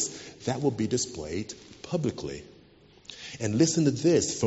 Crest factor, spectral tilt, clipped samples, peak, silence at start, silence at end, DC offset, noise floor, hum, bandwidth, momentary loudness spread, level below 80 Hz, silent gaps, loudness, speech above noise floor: 18 dB; -6 dB/octave; under 0.1%; -10 dBFS; 0 s; 0 s; under 0.1%; -56 dBFS; none; 8 kHz; 19 LU; -58 dBFS; none; -28 LUFS; 29 dB